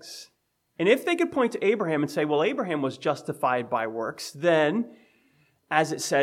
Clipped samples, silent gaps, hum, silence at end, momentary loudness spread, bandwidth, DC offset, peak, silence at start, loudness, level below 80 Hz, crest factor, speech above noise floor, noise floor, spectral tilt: under 0.1%; none; none; 0 s; 8 LU; 16 kHz; under 0.1%; -6 dBFS; 0.05 s; -26 LUFS; -78 dBFS; 20 dB; 47 dB; -72 dBFS; -4.5 dB/octave